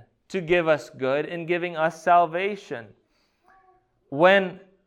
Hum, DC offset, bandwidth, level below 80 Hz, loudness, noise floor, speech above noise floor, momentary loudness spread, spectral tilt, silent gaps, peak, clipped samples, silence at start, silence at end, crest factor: none; under 0.1%; 11.5 kHz; -62 dBFS; -23 LUFS; -67 dBFS; 44 dB; 16 LU; -6 dB/octave; none; -4 dBFS; under 0.1%; 0.3 s; 0.3 s; 20 dB